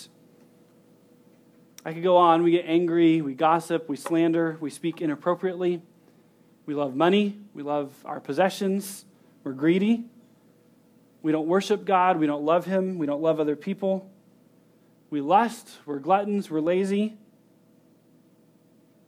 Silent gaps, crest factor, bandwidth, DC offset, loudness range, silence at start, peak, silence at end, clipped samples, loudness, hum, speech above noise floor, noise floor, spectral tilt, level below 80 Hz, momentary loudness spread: none; 20 dB; 15.5 kHz; under 0.1%; 5 LU; 0 s; -6 dBFS; 1.9 s; under 0.1%; -24 LUFS; none; 35 dB; -59 dBFS; -6.5 dB/octave; -84 dBFS; 13 LU